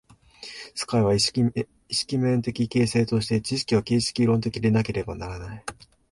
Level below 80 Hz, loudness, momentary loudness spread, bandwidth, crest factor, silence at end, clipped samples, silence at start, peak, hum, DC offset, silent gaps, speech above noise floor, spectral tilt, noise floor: -48 dBFS; -24 LUFS; 14 LU; 11.5 kHz; 18 dB; 0.4 s; under 0.1%; 0.4 s; -8 dBFS; none; under 0.1%; none; 21 dB; -5.5 dB/octave; -45 dBFS